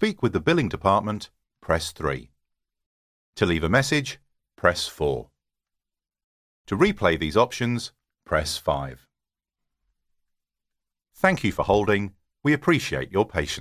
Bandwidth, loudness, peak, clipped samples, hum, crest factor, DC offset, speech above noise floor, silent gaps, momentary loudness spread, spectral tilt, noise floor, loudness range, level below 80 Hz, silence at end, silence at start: 16 kHz; -24 LUFS; -2 dBFS; under 0.1%; none; 22 dB; under 0.1%; 65 dB; 2.86-3.33 s, 6.24-6.65 s; 14 LU; -5 dB/octave; -88 dBFS; 4 LU; -44 dBFS; 0 s; 0 s